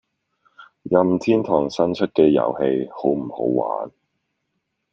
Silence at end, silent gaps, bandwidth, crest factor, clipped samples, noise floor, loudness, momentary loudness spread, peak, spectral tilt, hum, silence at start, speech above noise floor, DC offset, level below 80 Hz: 1.05 s; none; 7.6 kHz; 20 dB; under 0.1%; -75 dBFS; -20 LUFS; 9 LU; -2 dBFS; -7.5 dB/octave; none; 0.6 s; 56 dB; under 0.1%; -58 dBFS